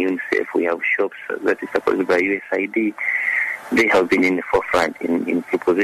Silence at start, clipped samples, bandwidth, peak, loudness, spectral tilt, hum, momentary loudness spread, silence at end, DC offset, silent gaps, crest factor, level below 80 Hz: 0 s; under 0.1%; 13.5 kHz; -6 dBFS; -19 LUFS; -5 dB/octave; none; 6 LU; 0 s; under 0.1%; none; 14 dB; -54 dBFS